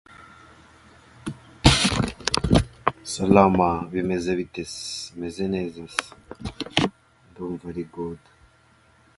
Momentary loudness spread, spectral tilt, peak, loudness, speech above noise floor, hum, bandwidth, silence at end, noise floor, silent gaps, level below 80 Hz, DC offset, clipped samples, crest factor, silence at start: 20 LU; -4.5 dB/octave; 0 dBFS; -24 LUFS; 33 dB; none; 11.5 kHz; 1 s; -58 dBFS; none; -38 dBFS; under 0.1%; under 0.1%; 24 dB; 0.2 s